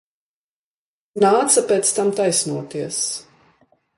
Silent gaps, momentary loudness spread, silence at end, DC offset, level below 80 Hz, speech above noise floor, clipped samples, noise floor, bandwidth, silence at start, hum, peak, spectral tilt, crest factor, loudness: none; 11 LU; 0.75 s; under 0.1%; -66 dBFS; over 71 dB; under 0.1%; under -90 dBFS; 11.5 kHz; 1.15 s; none; -2 dBFS; -3 dB/octave; 20 dB; -18 LUFS